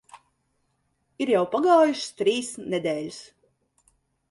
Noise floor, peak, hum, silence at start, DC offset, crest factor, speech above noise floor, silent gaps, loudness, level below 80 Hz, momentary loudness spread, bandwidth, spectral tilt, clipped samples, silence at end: -72 dBFS; -8 dBFS; none; 0.15 s; under 0.1%; 18 dB; 49 dB; none; -24 LUFS; -72 dBFS; 13 LU; 11.5 kHz; -4.5 dB/octave; under 0.1%; 1.1 s